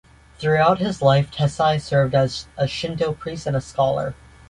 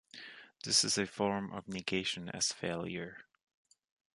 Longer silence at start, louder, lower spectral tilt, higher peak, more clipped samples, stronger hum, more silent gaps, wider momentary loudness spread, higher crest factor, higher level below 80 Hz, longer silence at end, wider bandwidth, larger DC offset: first, 0.4 s vs 0.15 s; first, -21 LUFS vs -34 LUFS; first, -6 dB/octave vs -2.5 dB/octave; first, -4 dBFS vs -14 dBFS; neither; neither; neither; second, 8 LU vs 19 LU; second, 18 dB vs 24 dB; first, -46 dBFS vs -68 dBFS; second, 0.35 s vs 0.95 s; about the same, 11 kHz vs 11.5 kHz; neither